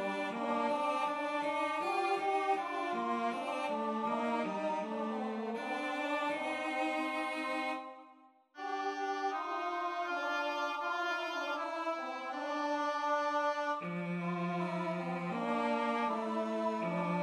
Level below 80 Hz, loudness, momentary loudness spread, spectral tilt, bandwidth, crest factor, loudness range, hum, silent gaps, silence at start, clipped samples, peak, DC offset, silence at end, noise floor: -86 dBFS; -36 LUFS; 5 LU; -5.5 dB/octave; 13.5 kHz; 14 dB; 3 LU; none; none; 0 s; under 0.1%; -22 dBFS; under 0.1%; 0 s; -62 dBFS